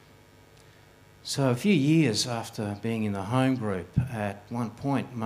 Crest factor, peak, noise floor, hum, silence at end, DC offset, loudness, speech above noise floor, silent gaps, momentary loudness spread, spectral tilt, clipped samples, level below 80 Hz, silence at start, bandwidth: 18 dB; -10 dBFS; -55 dBFS; 50 Hz at -50 dBFS; 0 s; under 0.1%; -27 LUFS; 28 dB; none; 11 LU; -5.5 dB/octave; under 0.1%; -56 dBFS; 1.25 s; 15.5 kHz